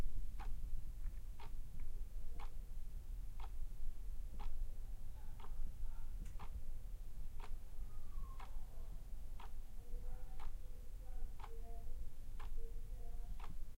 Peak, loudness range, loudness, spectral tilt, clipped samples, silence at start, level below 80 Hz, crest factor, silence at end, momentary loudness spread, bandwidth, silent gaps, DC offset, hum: -26 dBFS; 2 LU; -54 LUFS; -5.5 dB/octave; under 0.1%; 0 s; -44 dBFS; 14 dB; 0 s; 4 LU; 4 kHz; none; under 0.1%; none